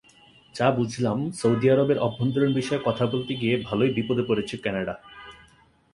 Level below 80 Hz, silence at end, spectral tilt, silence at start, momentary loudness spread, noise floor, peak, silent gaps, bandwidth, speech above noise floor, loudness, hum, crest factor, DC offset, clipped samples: -58 dBFS; 0.6 s; -6.5 dB/octave; 0.55 s; 10 LU; -58 dBFS; -6 dBFS; none; 11.5 kHz; 34 dB; -24 LUFS; none; 18 dB; under 0.1%; under 0.1%